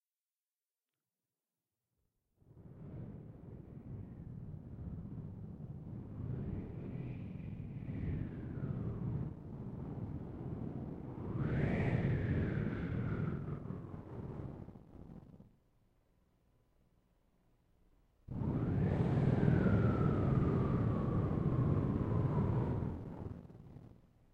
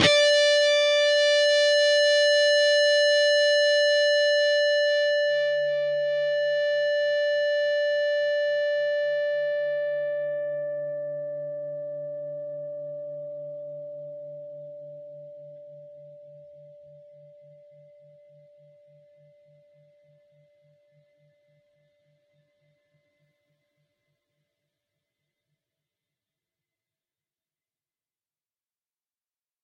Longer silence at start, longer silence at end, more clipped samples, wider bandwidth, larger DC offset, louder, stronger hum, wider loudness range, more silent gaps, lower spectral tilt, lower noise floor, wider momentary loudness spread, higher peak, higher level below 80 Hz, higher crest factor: first, 2.55 s vs 0 s; second, 0.4 s vs 13.2 s; neither; second, 5 kHz vs 10.5 kHz; neither; second, -38 LUFS vs -22 LUFS; neither; about the same, 19 LU vs 21 LU; neither; first, -10.5 dB/octave vs -1.5 dB/octave; about the same, under -90 dBFS vs under -90 dBFS; about the same, 19 LU vs 19 LU; second, -16 dBFS vs -6 dBFS; first, -52 dBFS vs -72 dBFS; about the same, 22 dB vs 22 dB